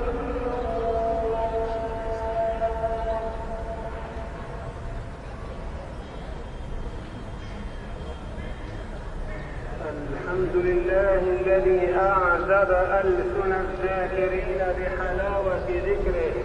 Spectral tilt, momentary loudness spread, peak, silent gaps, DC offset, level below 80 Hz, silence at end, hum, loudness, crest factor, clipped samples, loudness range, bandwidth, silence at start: -7.5 dB/octave; 16 LU; -10 dBFS; none; under 0.1%; -34 dBFS; 0 s; none; -26 LUFS; 16 dB; under 0.1%; 15 LU; 10.5 kHz; 0 s